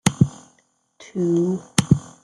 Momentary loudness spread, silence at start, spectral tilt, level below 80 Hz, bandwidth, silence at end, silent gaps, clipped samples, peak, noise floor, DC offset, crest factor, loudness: 5 LU; 0.05 s; -5.5 dB/octave; -48 dBFS; 12 kHz; 0.2 s; none; under 0.1%; 0 dBFS; -63 dBFS; under 0.1%; 22 dB; -21 LUFS